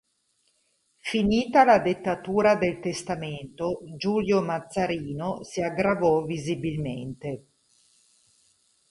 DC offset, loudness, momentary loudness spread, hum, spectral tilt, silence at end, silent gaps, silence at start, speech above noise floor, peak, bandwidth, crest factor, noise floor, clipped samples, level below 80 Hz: under 0.1%; -25 LUFS; 14 LU; none; -6 dB/octave; 1.55 s; none; 1.05 s; 46 dB; -6 dBFS; 11.5 kHz; 20 dB; -71 dBFS; under 0.1%; -54 dBFS